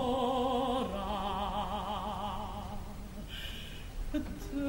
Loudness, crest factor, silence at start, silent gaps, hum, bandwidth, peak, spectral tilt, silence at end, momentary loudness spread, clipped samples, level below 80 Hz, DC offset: -36 LUFS; 16 dB; 0 s; none; none; 16 kHz; -20 dBFS; -5.5 dB/octave; 0 s; 13 LU; under 0.1%; -44 dBFS; under 0.1%